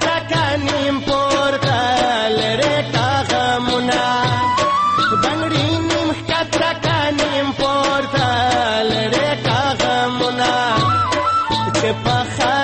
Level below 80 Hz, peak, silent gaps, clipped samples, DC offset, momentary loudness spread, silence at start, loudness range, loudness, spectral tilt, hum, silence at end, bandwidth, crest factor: -42 dBFS; -6 dBFS; none; under 0.1%; under 0.1%; 2 LU; 0 s; 1 LU; -17 LUFS; -4.5 dB/octave; none; 0 s; 8.8 kHz; 12 dB